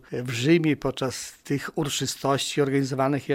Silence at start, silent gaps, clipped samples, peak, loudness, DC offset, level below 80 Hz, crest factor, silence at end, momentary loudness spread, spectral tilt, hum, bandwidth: 0.1 s; none; under 0.1%; -8 dBFS; -25 LUFS; under 0.1%; -56 dBFS; 16 dB; 0 s; 9 LU; -5 dB/octave; none; 16.5 kHz